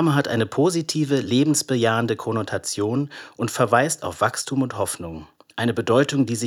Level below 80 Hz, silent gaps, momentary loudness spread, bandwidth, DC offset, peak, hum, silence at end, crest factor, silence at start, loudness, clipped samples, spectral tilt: -62 dBFS; none; 9 LU; 17 kHz; under 0.1%; -2 dBFS; none; 0 s; 20 dB; 0 s; -22 LUFS; under 0.1%; -5 dB/octave